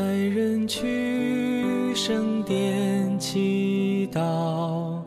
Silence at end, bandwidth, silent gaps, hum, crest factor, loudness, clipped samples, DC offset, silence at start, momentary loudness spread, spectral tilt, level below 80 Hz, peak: 0 s; 14 kHz; none; none; 12 dB; -25 LUFS; under 0.1%; under 0.1%; 0 s; 2 LU; -5.5 dB/octave; -62 dBFS; -14 dBFS